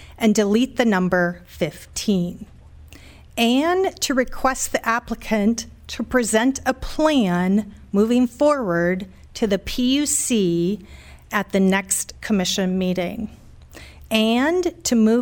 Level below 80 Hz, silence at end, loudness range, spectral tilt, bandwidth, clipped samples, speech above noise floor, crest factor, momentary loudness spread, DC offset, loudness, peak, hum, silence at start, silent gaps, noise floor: -42 dBFS; 0 s; 2 LU; -4.5 dB/octave; 19 kHz; under 0.1%; 24 dB; 16 dB; 9 LU; under 0.1%; -20 LUFS; -4 dBFS; none; 0 s; none; -44 dBFS